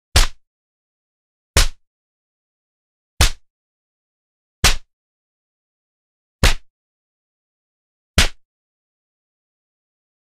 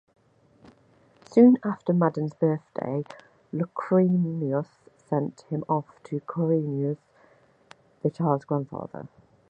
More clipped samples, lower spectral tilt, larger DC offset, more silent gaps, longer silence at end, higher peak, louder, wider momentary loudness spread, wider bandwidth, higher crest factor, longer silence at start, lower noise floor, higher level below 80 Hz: neither; second, -2.5 dB/octave vs -10.5 dB/octave; neither; first, 0.47-1.54 s, 1.87-3.17 s, 3.50-4.63 s, 4.93-6.39 s, 6.70-8.14 s vs none; first, 2 s vs 0.45 s; first, 0 dBFS vs -6 dBFS; first, -19 LUFS vs -26 LUFS; second, 7 LU vs 16 LU; first, 15.5 kHz vs 7.8 kHz; about the same, 24 dB vs 20 dB; second, 0.15 s vs 1.3 s; first, under -90 dBFS vs -60 dBFS; first, -26 dBFS vs -70 dBFS